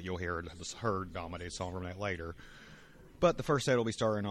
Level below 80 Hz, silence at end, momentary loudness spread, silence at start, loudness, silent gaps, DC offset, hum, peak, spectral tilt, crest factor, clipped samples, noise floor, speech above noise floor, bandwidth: -56 dBFS; 0 s; 18 LU; 0 s; -35 LUFS; none; under 0.1%; none; -14 dBFS; -5 dB/octave; 20 dB; under 0.1%; -55 dBFS; 21 dB; 13 kHz